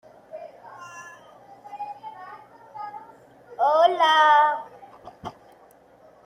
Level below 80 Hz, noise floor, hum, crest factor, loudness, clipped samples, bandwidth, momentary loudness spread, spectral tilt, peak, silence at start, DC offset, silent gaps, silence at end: -72 dBFS; -54 dBFS; 60 Hz at -65 dBFS; 20 dB; -19 LUFS; under 0.1%; 16 kHz; 26 LU; -2.5 dB/octave; -6 dBFS; 0.35 s; under 0.1%; none; 0.95 s